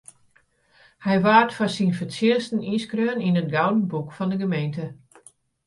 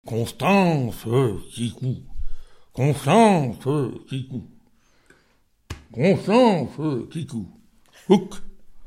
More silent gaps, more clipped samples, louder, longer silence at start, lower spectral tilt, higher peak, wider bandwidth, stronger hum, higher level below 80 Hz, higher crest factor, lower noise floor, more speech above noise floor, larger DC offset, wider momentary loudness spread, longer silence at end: neither; neither; about the same, -23 LUFS vs -21 LUFS; first, 1 s vs 0.05 s; about the same, -6.5 dB/octave vs -6.5 dB/octave; about the same, -2 dBFS vs -2 dBFS; second, 11.5 kHz vs 16 kHz; neither; second, -64 dBFS vs -42 dBFS; about the same, 22 dB vs 20 dB; about the same, -62 dBFS vs -62 dBFS; about the same, 40 dB vs 41 dB; neither; second, 11 LU vs 21 LU; first, 0.7 s vs 0 s